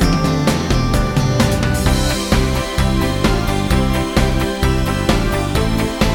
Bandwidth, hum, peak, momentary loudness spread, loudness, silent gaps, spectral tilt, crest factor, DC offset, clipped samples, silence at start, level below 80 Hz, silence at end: 19 kHz; none; -2 dBFS; 2 LU; -17 LUFS; none; -5.5 dB/octave; 14 dB; under 0.1%; under 0.1%; 0 s; -22 dBFS; 0 s